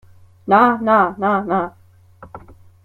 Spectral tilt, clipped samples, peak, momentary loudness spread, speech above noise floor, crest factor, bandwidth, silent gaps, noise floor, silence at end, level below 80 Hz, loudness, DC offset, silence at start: -8 dB/octave; under 0.1%; -2 dBFS; 12 LU; 29 dB; 18 dB; 13 kHz; none; -44 dBFS; 0.45 s; -56 dBFS; -16 LUFS; under 0.1%; 0.45 s